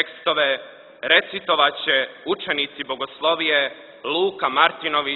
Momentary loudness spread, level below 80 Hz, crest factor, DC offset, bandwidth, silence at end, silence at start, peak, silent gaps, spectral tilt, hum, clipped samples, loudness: 10 LU; -66 dBFS; 20 dB; under 0.1%; 4.6 kHz; 0 s; 0 s; -2 dBFS; none; -6.5 dB/octave; none; under 0.1%; -20 LUFS